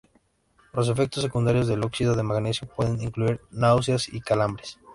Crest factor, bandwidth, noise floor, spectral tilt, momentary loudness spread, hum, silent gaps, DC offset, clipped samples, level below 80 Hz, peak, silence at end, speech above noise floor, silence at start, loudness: 18 dB; 11.5 kHz; -65 dBFS; -6 dB/octave; 6 LU; none; none; under 0.1%; under 0.1%; -48 dBFS; -6 dBFS; 0 s; 41 dB; 0.75 s; -25 LUFS